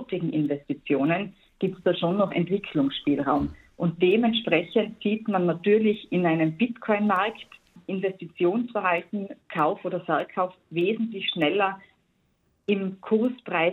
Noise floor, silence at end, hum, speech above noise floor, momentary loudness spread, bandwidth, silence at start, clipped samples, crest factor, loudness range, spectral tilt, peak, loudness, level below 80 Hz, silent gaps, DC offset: -69 dBFS; 0 s; none; 44 dB; 9 LU; 4.3 kHz; 0 s; under 0.1%; 18 dB; 4 LU; -8.5 dB/octave; -8 dBFS; -26 LUFS; -58 dBFS; none; under 0.1%